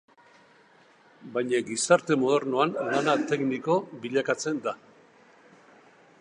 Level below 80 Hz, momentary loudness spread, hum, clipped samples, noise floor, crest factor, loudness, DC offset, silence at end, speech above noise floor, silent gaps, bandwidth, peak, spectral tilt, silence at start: -78 dBFS; 9 LU; none; under 0.1%; -58 dBFS; 22 dB; -26 LUFS; under 0.1%; 1.45 s; 32 dB; none; 11 kHz; -6 dBFS; -4.5 dB/octave; 1.2 s